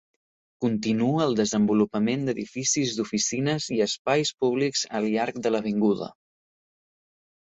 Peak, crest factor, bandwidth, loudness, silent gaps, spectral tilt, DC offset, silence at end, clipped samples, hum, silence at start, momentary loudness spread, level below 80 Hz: -8 dBFS; 18 dB; 8.2 kHz; -25 LUFS; 3.99-4.05 s; -4.5 dB/octave; under 0.1%; 1.3 s; under 0.1%; none; 0.6 s; 4 LU; -64 dBFS